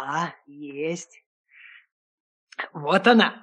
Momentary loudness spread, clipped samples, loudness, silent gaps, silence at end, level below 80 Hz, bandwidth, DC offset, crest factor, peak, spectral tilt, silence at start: 23 LU; under 0.1%; -23 LUFS; 1.26-1.44 s, 1.92-2.47 s; 0.05 s; -78 dBFS; 9.8 kHz; under 0.1%; 22 dB; -4 dBFS; -4.5 dB/octave; 0 s